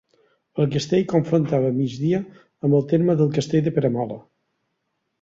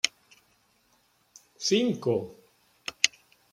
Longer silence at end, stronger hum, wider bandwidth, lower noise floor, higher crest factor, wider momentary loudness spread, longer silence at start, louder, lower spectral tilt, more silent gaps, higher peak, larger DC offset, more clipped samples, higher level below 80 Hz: first, 1 s vs 0.45 s; neither; second, 7.8 kHz vs 16.5 kHz; first, -75 dBFS vs -67 dBFS; second, 16 dB vs 32 dB; second, 9 LU vs 15 LU; first, 0.55 s vs 0.05 s; first, -21 LUFS vs -28 LUFS; first, -7.5 dB/octave vs -2.5 dB/octave; neither; second, -6 dBFS vs 0 dBFS; neither; neither; first, -58 dBFS vs -74 dBFS